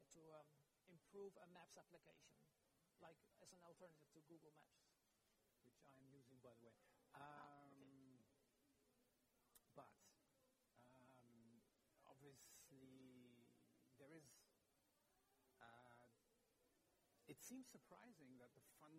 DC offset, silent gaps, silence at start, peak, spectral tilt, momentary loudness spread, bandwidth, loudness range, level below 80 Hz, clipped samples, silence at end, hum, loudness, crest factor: under 0.1%; none; 0 s; -48 dBFS; -4 dB/octave; 8 LU; 16 kHz; 3 LU; under -90 dBFS; under 0.1%; 0 s; none; -66 LUFS; 22 dB